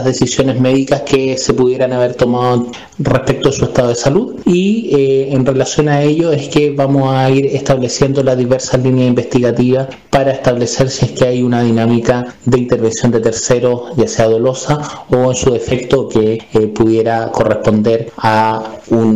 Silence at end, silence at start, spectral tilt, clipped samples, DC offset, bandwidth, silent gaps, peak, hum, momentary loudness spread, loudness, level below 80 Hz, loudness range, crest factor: 0 s; 0 s; -6 dB/octave; under 0.1%; 0.7%; 9.8 kHz; none; -2 dBFS; none; 3 LU; -13 LUFS; -38 dBFS; 1 LU; 10 dB